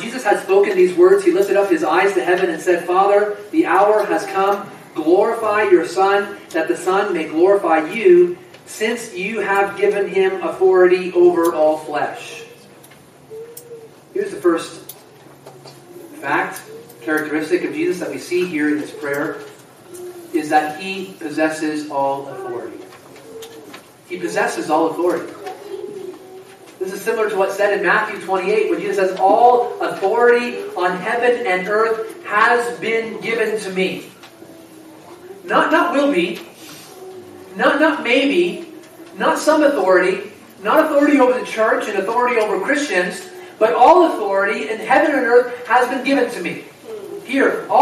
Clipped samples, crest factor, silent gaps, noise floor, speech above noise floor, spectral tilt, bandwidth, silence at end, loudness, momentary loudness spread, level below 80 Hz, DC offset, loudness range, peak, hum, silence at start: under 0.1%; 18 dB; none; -44 dBFS; 28 dB; -4.5 dB/octave; 15 kHz; 0 s; -17 LUFS; 19 LU; -68 dBFS; under 0.1%; 8 LU; 0 dBFS; none; 0 s